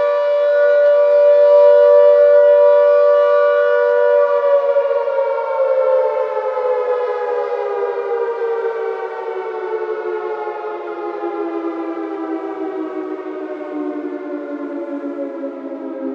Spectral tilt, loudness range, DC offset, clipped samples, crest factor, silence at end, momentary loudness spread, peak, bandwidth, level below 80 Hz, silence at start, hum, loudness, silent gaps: -5 dB/octave; 14 LU; under 0.1%; under 0.1%; 14 dB; 0 s; 16 LU; -2 dBFS; 5.4 kHz; under -90 dBFS; 0 s; none; -16 LUFS; none